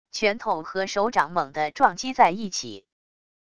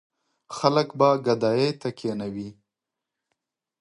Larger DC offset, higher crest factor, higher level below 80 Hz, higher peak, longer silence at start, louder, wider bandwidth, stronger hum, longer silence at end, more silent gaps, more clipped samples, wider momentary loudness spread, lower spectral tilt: first, 0.3% vs under 0.1%; about the same, 22 dB vs 24 dB; first, -60 dBFS vs -68 dBFS; about the same, -4 dBFS vs -2 dBFS; second, 0.15 s vs 0.5 s; about the same, -24 LUFS vs -24 LUFS; about the same, 11 kHz vs 11 kHz; neither; second, 0.8 s vs 1.3 s; neither; neither; second, 9 LU vs 15 LU; second, -3 dB/octave vs -6 dB/octave